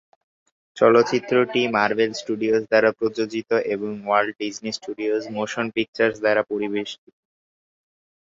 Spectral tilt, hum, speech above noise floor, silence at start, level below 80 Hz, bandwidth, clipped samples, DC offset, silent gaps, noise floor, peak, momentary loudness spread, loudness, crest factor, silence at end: -4.5 dB/octave; none; over 69 dB; 0.75 s; -66 dBFS; 7.8 kHz; under 0.1%; under 0.1%; 5.88-5.93 s; under -90 dBFS; -2 dBFS; 10 LU; -22 LUFS; 20 dB; 1.35 s